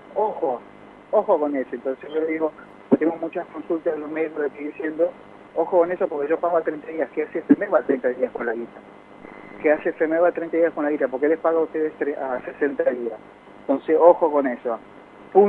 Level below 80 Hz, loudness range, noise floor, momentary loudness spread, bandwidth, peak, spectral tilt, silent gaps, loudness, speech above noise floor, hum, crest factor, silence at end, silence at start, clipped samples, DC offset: -66 dBFS; 3 LU; -42 dBFS; 10 LU; 4 kHz; 0 dBFS; -9 dB/octave; none; -23 LUFS; 20 dB; none; 22 dB; 0 s; 0.1 s; under 0.1%; under 0.1%